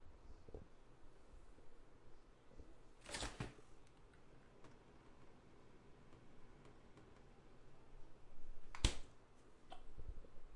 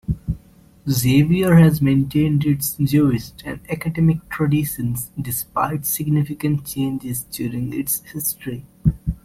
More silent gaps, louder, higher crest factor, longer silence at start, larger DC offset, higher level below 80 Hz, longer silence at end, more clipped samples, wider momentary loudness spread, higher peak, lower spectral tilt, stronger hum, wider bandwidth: neither; second, -51 LUFS vs -20 LUFS; first, 32 dB vs 18 dB; about the same, 0 s vs 0.1 s; neither; second, -56 dBFS vs -38 dBFS; about the same, 0 s vs 0.1 s; neither; first, 20 LU vs 12 LU; second, -18 dBFS vs -2 dBFS; second, -3.5 dB/octave vs -6 dB/octave; neither; second, 11 kHz vs 16.5 kHz